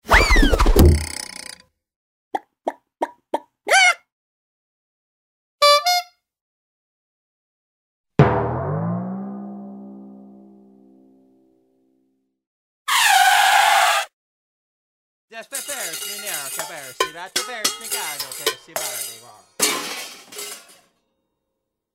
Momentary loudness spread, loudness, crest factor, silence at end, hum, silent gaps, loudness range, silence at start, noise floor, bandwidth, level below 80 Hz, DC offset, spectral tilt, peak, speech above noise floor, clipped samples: 20 LU; -19 LUFS; 22 dB; 1.35 s; none; 1.96-2.31 s, 4.12-5.59 s, 6.41-8.04 s, 12.47-12.85 s, 14.13-15.28 s; 9 LU; 0.05 s; -79 dBFS; 16.5 kHz; -30 dBFS; under 0.1%; -3 dB/octave; 0 dBFS; 50 dB; under 0.1%